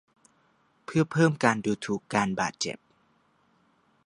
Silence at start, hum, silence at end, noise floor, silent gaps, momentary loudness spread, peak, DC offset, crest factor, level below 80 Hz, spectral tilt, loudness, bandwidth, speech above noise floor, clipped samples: 0.9 s; none; 1.3 s; -67 dBFS; none; 10 LU; -4 dBFS; under 0.1%; 24 dB; -66 dBFS; -5.5 dB/octave; -27 LUFS; 11 kHz; 41 dB; under 0.1%